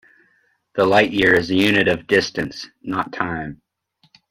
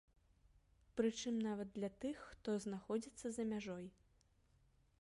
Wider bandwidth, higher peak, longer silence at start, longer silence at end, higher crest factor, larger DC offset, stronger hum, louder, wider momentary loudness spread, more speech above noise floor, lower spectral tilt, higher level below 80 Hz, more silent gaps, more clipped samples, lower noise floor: first, 16 kHz vs 11.5 kHz; first, 0 dBFS vs -26 dBFS; second, 0.75 s vs 0.95 s; second, 0.75 s vs 1.15 s; about the same, 20 dB vs 20 dB; neither; neither; first, -18 LUFS vs -44 LUFS; first, 14 LU vs 9 LU; first, 44 dB vs 32 dB; about the same, -5 dB/octave vs -5 dB/octave; first, -52 dBFS vs -72 dBFS; neither; neither; second, -63 dBFS vs -75 dBFS